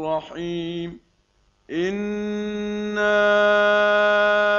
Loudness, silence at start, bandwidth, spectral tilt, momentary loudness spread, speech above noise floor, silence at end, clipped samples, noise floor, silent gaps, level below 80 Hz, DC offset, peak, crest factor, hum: -21 LUFS; 0 s; 7.2 kHz; -5 dB/octave; 13 LU; 43 dB; 0 s; under 0.1%; -63 dBFS; none; -56 dBFS; under 0.1%; -6 dBFS; 16 dB; none